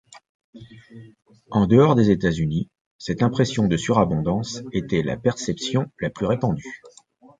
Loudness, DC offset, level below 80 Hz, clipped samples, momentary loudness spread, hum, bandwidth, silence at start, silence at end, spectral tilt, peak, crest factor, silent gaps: -22 LUFS; under 0.1%; -46 dBFS; under 0.1%; 13 LU; none; 9.4 kHz; 0.15 s; 0.5 s; -6.5 dB/octave; -2 dBFS; 20 dB; 0.29-0.53 s, 2.81-2.99 s